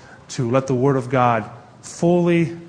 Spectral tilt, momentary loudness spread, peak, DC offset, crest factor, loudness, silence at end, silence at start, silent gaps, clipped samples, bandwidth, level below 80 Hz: -7 dB/octave; 18 LU; -2 dBFS; under 0.1%; 18 dB; -19 LUFS; 0 s; 0.1 s; none; under 0.1%; 10 kHz; -54 dBFS